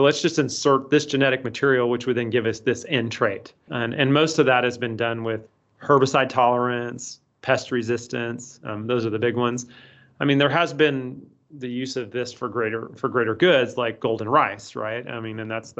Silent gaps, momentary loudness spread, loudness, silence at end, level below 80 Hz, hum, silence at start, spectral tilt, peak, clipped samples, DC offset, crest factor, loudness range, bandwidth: none; 13 LU; -22 LUFS; 0.1 s; -66 dBFS; none; 0 s; -5 dB/octave; -4 dBFS; under 0.1%; under 0.1%; 18 dB; 3 LU; 8.2 kHz